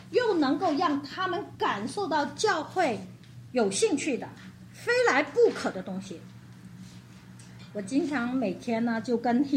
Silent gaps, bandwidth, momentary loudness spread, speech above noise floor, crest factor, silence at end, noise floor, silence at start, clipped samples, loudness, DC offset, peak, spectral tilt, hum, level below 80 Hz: none; 15 kHz; 23 LU; 21 dB; 18 dB; 0 s; -48 dBFS; 0 s; under 0.1%; -28 LUFS; under 0.1%; -10 dBFS; -4.5 dB/octave; none; -68 dBFS